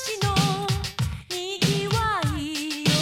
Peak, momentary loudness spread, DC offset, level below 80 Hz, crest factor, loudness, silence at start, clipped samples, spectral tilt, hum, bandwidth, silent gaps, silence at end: -10 dBFS; 7 LU; under 0.1%; -40 dBFS; 16 dB; -25 LUFS; 0 s; under 0.1%; -4.5 dB/octave; none; 17 kHz; none; 0 s